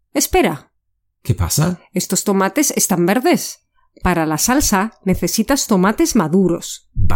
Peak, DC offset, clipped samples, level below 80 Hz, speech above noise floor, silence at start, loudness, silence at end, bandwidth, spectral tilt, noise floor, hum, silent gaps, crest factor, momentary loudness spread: -2 dBFS; under 0.1%; under 0.1%; -30 dBFS; 54 dB; 0.15 s; -16 LUFS; 0 s; 17 kHz; -4.5 dB/octave; -70 dBFS; none; none; 16 dB; 9 LU